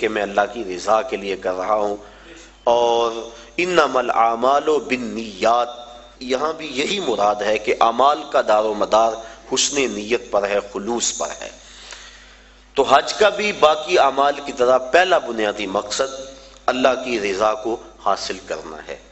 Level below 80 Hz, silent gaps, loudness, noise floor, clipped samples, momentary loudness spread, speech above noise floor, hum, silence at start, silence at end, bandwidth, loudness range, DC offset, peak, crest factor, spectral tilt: -52 dBFS; none; -19 LUFS; -47 dBFS; under 0.1%; 14 LU; 28 dB; none; 0 s; 0.1 s; 8.4 kHz; 5 LU; under 0.1%; 0 dBFS; 20 dB; -2.5 dB/octave